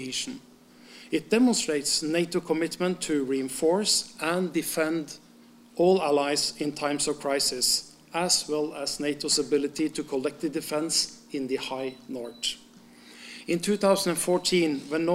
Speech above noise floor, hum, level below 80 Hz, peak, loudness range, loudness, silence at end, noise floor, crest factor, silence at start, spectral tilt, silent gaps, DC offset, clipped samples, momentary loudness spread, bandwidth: 27 dB; none; -64 dBFS; -8 dBFS; 4 LU; -26 LUFS; 0 s; -53 dBFS; 18 dB; 0 s; -3 dB/octave; none; under 0.1%; under 0.1%; 11 LU; 16 kHz